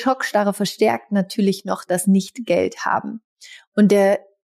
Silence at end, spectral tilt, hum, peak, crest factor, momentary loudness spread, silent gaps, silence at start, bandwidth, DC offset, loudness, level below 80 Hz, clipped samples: 0.3 s; -5.5 dB/octave; none; -6 dBFS; 14 dB; 9 LU; 3.24-3.36 s, 3.67-3.72 s; 0 s; 15 kHz; under 0.1%; -19 LUFS; -68 dBFS; under 0.1%